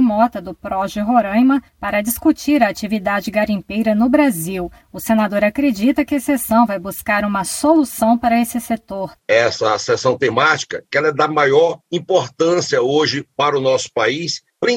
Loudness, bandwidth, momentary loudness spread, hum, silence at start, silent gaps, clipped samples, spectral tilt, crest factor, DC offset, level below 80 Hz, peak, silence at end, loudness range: -17 LUFS; 17 kHz; 8 LU; none; 0 s; none; under 0.1%; -4.5 dB/octave; 16 dB; under 0.1%; -48 dBFS; 0 dBFS; 0 s; 1 LU